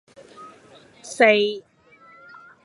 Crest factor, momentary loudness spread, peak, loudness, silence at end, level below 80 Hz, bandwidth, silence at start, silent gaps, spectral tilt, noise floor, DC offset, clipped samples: 22 dB; 27 LU; -2 dBFS; -18 LUFS; 1.05 s; -76 dBFS; 11.5 kHz; 0.4 s; none; -3 dB/octave; -52 dBFS; under 0.1%; under 0.1%